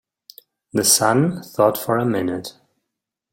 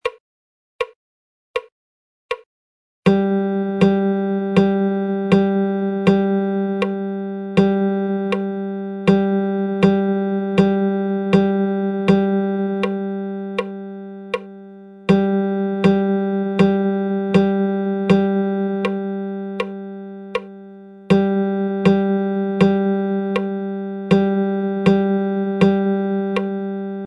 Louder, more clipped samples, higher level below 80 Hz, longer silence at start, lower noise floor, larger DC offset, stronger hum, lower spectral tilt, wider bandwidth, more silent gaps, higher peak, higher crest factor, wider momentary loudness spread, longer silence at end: about the same, -18 LUFS vs -19 LUFS; neither; second, -60 dBFS vs -54 dBFS; first, 0.75 s vs 0.05 s; first, -81 dBFS vs -39 dBFS; neither; neither; second, -3.5 dB/octave vs -8.5 dB/octave; first, 17 kHz vs 7.2 kHz; second, none vs 0.20-0.79 s, 0.96-1.54 s, 1.72-2.29 s, 2.46-3.03 s; about the same, 0 dBFS vs -2 dBFS; about the same, 22 dB vs 18 dB; about the same, 12 LU vs 12 LU; first, 0.85 s vs 0 s